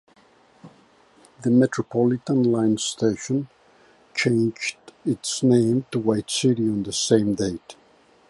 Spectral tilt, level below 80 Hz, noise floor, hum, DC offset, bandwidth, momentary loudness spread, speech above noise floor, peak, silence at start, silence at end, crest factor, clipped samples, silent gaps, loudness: -5 dB/octave; -58 dBFS; -56 dBFS; none; under 0.1%; 11.5 kHz; 10 LU; 35 dB; -4 dBFS; 0.65 s; 0.6 s; 20 dB; under 0.1%; none; -22 LUFS